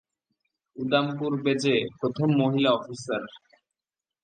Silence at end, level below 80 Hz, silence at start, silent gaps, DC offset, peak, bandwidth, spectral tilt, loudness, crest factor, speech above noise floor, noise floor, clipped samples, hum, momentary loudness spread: 0.85 s; -70 dBFS; 0.75 s; none; under 0.1%; -8 dBFS; 9.4 kHz; -6 dB/octave; -26 LUFS; 20 dB; over 65 dB; under -90 dBFS; under 0.1%; none; 10 LU